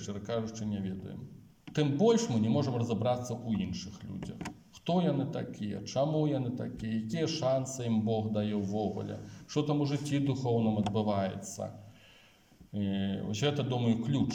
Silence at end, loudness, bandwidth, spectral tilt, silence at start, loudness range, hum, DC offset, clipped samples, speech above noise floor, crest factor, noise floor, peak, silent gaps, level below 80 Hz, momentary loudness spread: 0 s; -32 LUFS; 16 kHz; -6.5 dB/octave; 0 s; 3 LU; none; under 0.1%; under 0.1%; 29 dB; 18 dB; -61 dBFS; -14 dBFS; none; -64 dBFS; 12 LU